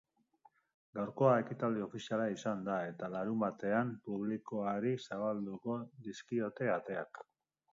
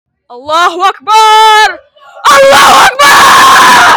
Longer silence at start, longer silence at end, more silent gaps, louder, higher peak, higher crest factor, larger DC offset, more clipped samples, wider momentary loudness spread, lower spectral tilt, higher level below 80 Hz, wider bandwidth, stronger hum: first, 0.95 s vs 0.3 s; first, 0.5 s vs 0 s; neither; second, -37 LUFS vs -3 LUFS; second, -16 dBFS vs 0 dBFS; first, 22 dB vs 4 dB; neither; second, under 0.1% vs 5%; about the same, 10 LU vs 9 LU; first, -6 dB/octave vs -0.5 dB/octave; second, -80 dBFS vs -40 dBFS; second, 7.4 kHz vs over 20 kHz; neither